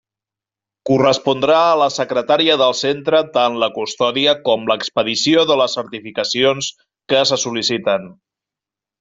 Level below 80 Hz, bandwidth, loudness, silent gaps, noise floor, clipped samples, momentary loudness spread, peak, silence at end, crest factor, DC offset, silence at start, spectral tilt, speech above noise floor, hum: -60 dBFS; 7.8 kHz; -16 LUFS; none; -88 dBFS; under 0.1%; 7 LU; 0 dBFS; 0.9 s; 16 dB; under 0.1%; 0.85 s; -3.5 dB/octave; 72 dB; none